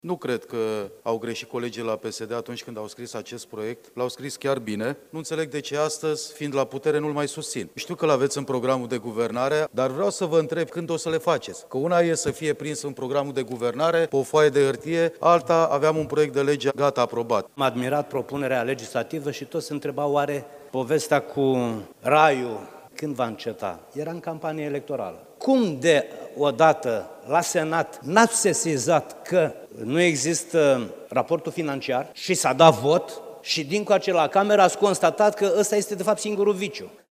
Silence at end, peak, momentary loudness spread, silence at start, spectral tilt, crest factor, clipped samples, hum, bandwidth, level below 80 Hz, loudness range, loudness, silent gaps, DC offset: 0.15 s; 0 dBFS; 12 LU; 0.05 s; -4.5 dB/octave; 24 dB; under 0.1%; none; 16 kHz; -68 dBFS; 8 LU; -24 LUFS; none; under 0.1%